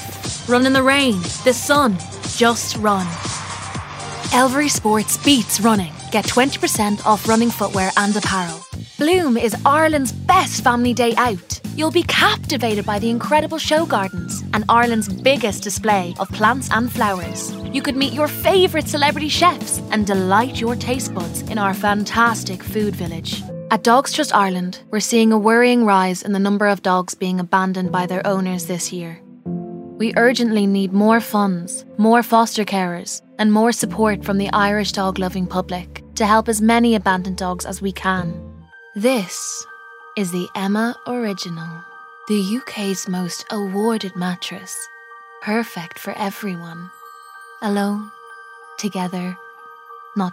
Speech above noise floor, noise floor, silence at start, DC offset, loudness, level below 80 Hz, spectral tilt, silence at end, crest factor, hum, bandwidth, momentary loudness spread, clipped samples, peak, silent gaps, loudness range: 22 dB; -40 dBFS; 0 s; under 0.1%; -18 LUFS; -46 dBFS; -4 dB/octave; 0 s; 18 dB; none; 16 kHz; 14 LU; under 0.1%; 0 dBFS; none; 8 LU